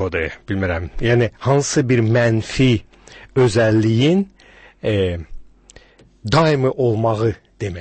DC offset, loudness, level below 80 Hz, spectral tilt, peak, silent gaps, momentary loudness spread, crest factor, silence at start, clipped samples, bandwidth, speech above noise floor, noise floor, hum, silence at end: under 0.1%; -18 LUFS; -38 dBFS; -6 dB/octave; -4 dBFS; none; 9 LU; 14 dB; 0 s; under 0.1%; 8.8 kHz; 31 dB; -48 dBFS; none; 0 s